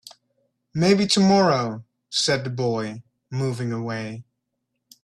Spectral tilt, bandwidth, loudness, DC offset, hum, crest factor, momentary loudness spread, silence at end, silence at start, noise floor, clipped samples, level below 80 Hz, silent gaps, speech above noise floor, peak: -5 dB/octave; 12.5 kHz; -22 LUFS; under 0.1%; none; 18 dB; 17 LU; 0.8 s; 0.05 s; -78 dBFS; under 0.1%; -60 dBFS; none; 57 dB; -6 dBFS